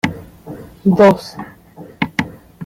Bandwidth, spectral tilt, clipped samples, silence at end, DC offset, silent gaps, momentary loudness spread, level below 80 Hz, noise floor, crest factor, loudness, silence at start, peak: 16 kHz; -7 dB/octave; under 0.1%; 0 s; under 0.1%; none; 24 LU; -48 dBFS; -39 dBFS; 16 dB; -15 LUFS; 0.05 s; -2 dBFS